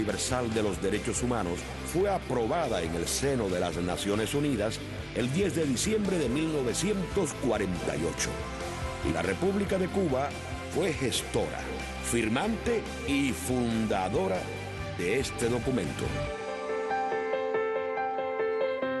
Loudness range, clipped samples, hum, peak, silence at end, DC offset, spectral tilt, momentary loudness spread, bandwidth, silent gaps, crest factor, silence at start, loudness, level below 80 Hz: 2 LU; under 0.1%; none; -14 dBFS; 0 s; under 0.1%; -4.5 dB/octave; 6 LU; 12.5 kHz; none; 14 dB; 0 s; -30 LUFS; -46 dBFS